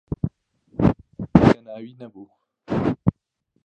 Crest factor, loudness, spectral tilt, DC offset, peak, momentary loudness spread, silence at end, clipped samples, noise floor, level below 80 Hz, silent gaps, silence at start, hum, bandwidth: 22 dB; -21 LUFS; -9 dB/octave; under 0.1%; 0 dBFS; 23 LU; 0.55 s; under 0.1%; -72 dBFS; -40 dBFS; none; 0.1 s; none; 8.4 kHz